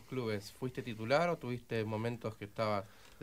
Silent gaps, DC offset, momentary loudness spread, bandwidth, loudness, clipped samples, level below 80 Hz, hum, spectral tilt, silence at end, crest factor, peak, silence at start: none; under 0.1%; 10 LU; 16 kHz; -37 LUFS; under 0.1%; -68 dBFS; none; -6.5 dB/octave; 0.05 s; 20 dB; -18 dBFS; 0 s